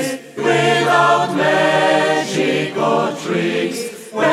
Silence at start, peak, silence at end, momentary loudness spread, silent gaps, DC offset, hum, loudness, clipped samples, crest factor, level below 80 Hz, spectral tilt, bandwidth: 0 s; -2 dBFS; 0 s; 8 LU; none; under 0.1%; none; -16 LUFS; under 0.1%; 14 dB; -68 dBFS; -4.5 dB/octave; 15.5 kHz